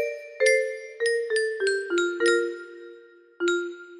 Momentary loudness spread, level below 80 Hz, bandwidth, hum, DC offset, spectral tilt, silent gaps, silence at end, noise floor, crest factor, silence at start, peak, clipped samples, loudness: 11 LU; -74 dBFS; 11.5 kHz; none; under 0.1%; -1 dB/octave; none; 0 s; -50 dBFS; 18 dB; 0 s; -8 dBFS; under 0.1%; -25 LUFS